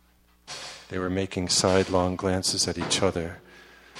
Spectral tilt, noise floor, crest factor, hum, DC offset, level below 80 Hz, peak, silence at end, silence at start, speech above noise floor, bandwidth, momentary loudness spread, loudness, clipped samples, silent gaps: -3.5 dB/octave; -54 dBFS; 20 dB; none; under 0.1%; -52 dBFS; -6 dBFS; 0 s; 0.45 s; 29 dB; 15 kHz; 16 LU; -25 LUFS; under 0.1%; none